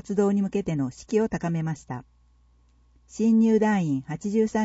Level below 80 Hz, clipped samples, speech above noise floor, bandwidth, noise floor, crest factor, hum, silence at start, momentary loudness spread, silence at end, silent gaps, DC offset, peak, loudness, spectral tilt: -56 dBFS; under 0.1%; 36 dB; 8 kHz; -60 dBFS; 14 dB; 60 Hz at -60 dBFS; 0.05 s; 13 LU; 0 s; none; under 0.1%; -10 dBFS; -25 LUFS; -7.5 dB/octave